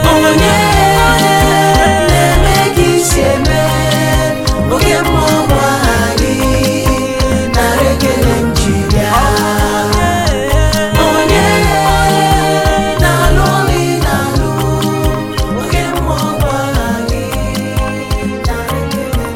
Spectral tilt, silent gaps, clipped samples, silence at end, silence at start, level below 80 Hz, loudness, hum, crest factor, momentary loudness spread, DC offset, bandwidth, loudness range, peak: -4.5 dB/octave; none; under 0.1%; 0 s; 0 s; -20 dBFS; -11 LUFS; none; 10 dB; 8 LU; under 0.1%; 17 kHz; 5 LU; 0 dBFS